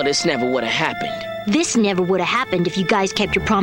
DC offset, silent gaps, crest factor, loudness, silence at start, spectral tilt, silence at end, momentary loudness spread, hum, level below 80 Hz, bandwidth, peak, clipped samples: under 0.1%; none; 16 dB; -19 LUFS; 0 s; -4 dB/octave; 0 s; 4 LU; none; -44 dBFS; 16.5 kHz; -4 dBFS; under 0.1%